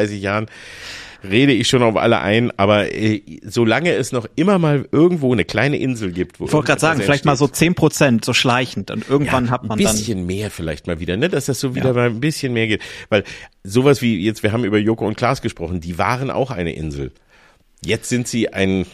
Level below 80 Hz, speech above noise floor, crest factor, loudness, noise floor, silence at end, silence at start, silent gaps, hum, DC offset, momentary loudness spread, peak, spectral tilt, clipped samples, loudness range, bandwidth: -44 dBFS; 34 dB; 16 dB; -18 LUFS; -52 dBFS; 0.05 s; 0 s; none; none; under 0.1%; 10 LU; -2 dBFS; -5 dB/octave; under 0.1%; 4 LU; 15.5 kHz